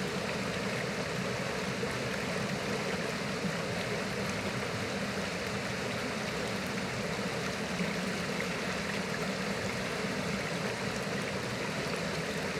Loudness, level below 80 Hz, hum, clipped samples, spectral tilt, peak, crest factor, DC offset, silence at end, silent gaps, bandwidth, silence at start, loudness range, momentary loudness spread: -34 LUFS; -58 dBFS; none; under 0.1%; -4 dB/octave; -20 dBFS; 14 dB; under 0.1%; 0 s; none; 16.5 kHz; 0 s; 0 LU; 1 LU